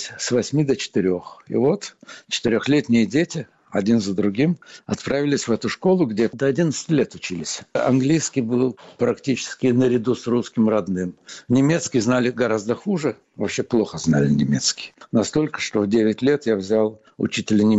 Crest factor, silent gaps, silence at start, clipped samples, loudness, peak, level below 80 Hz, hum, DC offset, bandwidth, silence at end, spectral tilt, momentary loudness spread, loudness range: 12 dB; none; 0 s; under 0.1%; -21 LUFS; -8 dBFS; -56 dBFS; none; under 0.1%; 8.2 kHz; 0 s; -5.5 dB/octave; 9 LU; 1 LU